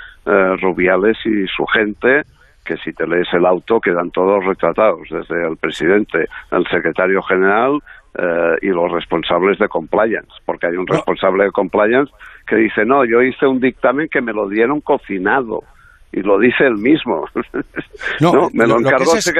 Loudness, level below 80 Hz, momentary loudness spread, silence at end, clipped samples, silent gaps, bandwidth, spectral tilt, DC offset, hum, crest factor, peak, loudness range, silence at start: -15 LUFS; -48 dBFS; 10 LU; 0 s; under 0.1%; none; 13.5 kHz; -5.5 dB/octave; under 0.1%; none; 14 dB; -2 dBFS; 2 LU; 0 s